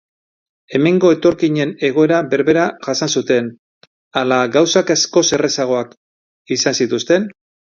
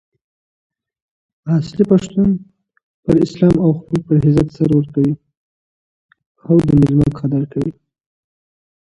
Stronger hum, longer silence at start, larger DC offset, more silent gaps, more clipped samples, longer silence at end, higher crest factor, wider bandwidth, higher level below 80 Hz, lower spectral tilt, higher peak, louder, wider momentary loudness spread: neither; second, 0.7 s vs 1.45 s; neither; second, 3.59-3.81 s, 3.87-4.11 s, 5.97-6.45 s vs 2.83-3.03 s, 5.37-6.09 s, 6.26-6.35 s; neither; second, 0.45 s vs 1.3 s; about the same, 16 dB vs 16 dB; second, 7.4 kHz vs 9.6 kHz; second, -58 dBFS vs -42 dBFS; second, -4 dB/octave vs -9.5 dB/octave; about the same, 0 dBFS vs 0 dBFS; about the same, -15 LUFS vs -15 LUFS; about the same, 8 LU vs 10 LU